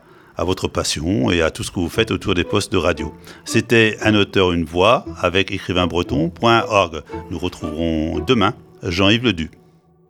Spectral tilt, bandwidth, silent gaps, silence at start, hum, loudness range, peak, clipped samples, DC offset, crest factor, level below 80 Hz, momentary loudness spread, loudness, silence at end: -5 dB/octave; 17.5 kHz; none; 0.4 s; none; 3 LU; 0 dBFS; under 0.1%; under 0.1%; 18 dB; -38 dBFS; 11 LU; -18 LUFS; 0.6 s